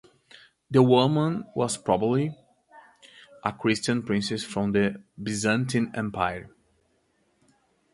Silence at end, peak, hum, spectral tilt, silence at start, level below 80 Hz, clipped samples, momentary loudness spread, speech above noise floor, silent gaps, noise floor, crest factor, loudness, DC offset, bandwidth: 1.45 s; -4 dBFS; none; -5.5 dB/octave; 0.7 s; -58 dBFS; under 0.1%; 12 LU; 44 dB; none; -69 dBFS; 22 dB; -25 LUFS; under 0.1%; 11.5 kHz